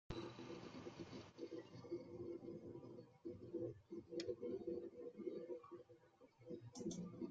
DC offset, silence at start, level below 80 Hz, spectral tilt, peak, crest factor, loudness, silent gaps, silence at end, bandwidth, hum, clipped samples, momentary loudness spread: under 0.1%; 0.1 s; -76 dBFS; -6.5 dB/octave; -32 dBFS; 20 dB; -53 LUFS; none; 0 s; 7.6 kHz; none; under 0.1%; 9 LU